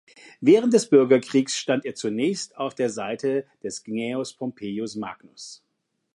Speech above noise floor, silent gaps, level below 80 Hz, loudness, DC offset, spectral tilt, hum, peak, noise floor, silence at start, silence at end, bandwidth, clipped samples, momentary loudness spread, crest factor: 53 dB; none; -72 dBFS; -23 LUFS; under 0.1%; -5 dB/octave; none; -4 dBFS; -76 dBFS; 0.4 s; 0.6 s; 11.5 kHz; under 0.1%; 17 LU; 20 dB